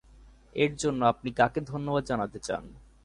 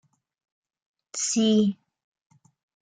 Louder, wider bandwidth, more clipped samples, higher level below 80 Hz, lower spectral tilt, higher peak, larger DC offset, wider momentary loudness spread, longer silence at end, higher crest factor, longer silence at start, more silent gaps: second, -29 LUFS vs -23 LUFS; first, 11.5 kHz vs 9.6 kHz; neither; first, -54 dBFS vs -70 dBFS; first, -5.5 dB/octave vs -4 dB/octave; first, -8 dBFS vs -12 dBFS; neither; second, 9 LU vs 16 LU; second, 0.25 s vs 1.1 s; about the same, 20 dB vs 18 dB; second, 0.55 s vs 1.15 s; neither